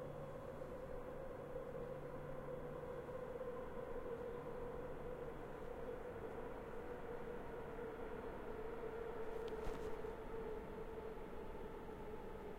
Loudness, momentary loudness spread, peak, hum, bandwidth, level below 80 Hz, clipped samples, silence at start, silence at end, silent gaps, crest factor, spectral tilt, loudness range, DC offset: -50 LUFS; 4 LU; -32 dBFS; none; 16 kHz; -58 dBFS; under 0.1%; 0 s; 0 s; none; 16 dB; -7 dB/octave; 1 LU; under 0.1%